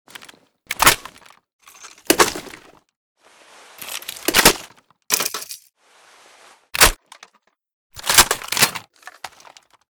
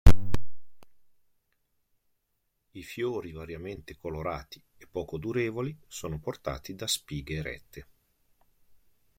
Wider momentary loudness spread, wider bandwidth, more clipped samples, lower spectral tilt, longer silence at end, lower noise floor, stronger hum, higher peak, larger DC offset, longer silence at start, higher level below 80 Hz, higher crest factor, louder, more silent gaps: first, 24 LU vs 14 LU; first, over 20 kHz vs 16.5 kHz; neither; second, -0.5 dB/octave vs -5 dB/octave; second, 0.65 s vs 1.35 s; second, -59 dBFS vs -77 dBFS; neither; about the same, 0 dBFS vs -2 dBFS; neither; first, 0.7 s vs 0.05 s; about the same, -40 dBFS vs -36 dBFS; about the same, 22 dB vs 24 dB; first, -16 LUFS vs -34 LUFS; first, 1.53-1.59 s, 2.96-3.15 s, 7.73-7.90 s vs none